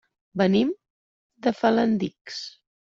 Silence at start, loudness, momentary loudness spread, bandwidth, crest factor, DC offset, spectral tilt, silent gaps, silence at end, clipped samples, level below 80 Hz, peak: 0.35 s; -24 LUFS; 15 LU; 7.4 kHz; 18 dB; under 0.1%; -6.5 dB/octave; 0.90-1.30 s, 2.21-2.25 s; 0.45 s; under 0.1%; -64 dBFS; -8 dBFS